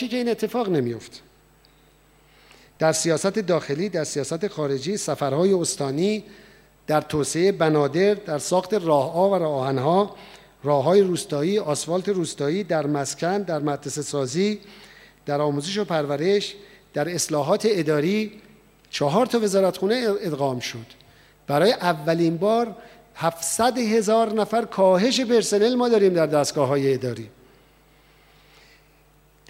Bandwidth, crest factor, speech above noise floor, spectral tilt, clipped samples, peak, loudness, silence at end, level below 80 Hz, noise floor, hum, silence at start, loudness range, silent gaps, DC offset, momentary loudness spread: 16.5 kHz; 18 dB; 35 dB; -5 dB/octave; under 0.1%; -6 dBFS; -22 LUFS; 2.2 s; -60 dBFS; -57 dBFS; none; 0 s; 5 LU; none; under 0.1%; 9 LU